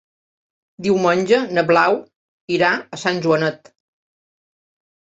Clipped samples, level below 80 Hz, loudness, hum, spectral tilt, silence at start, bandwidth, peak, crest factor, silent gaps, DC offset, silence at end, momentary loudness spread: under 0.1%; -62 dBFS; -18 LUFS; none; -5.5 dB/octave; 0.8 s; 8 kHz; -2 dBFS; 18 dB; 2.16-2.48 s; under 0.1%; 1.5 s; 9 LU